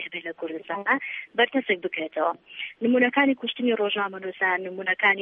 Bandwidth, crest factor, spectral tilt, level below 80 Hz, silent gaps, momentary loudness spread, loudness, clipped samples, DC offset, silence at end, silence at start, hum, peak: 3.8 kHz; 18 dB; -6.5 dB/octave; -80 dBFS; none; 12 LU; -25 LUFS; under 0.1%; under 0.1%; 0 s; 0 s; none; -8 dBFS